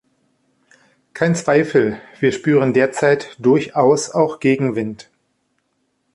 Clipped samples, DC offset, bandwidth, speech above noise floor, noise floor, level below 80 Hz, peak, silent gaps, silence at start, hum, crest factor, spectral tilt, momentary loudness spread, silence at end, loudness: under 0.1%; under 0.1%; 11.5 kHz; 52 dB; -68 dBFS; -58 dBFS; -2 dBFS; none; 1.15 s; none; 16 dB; -6 dB/octave; 8 LU; 1.1 s; -17 LUFS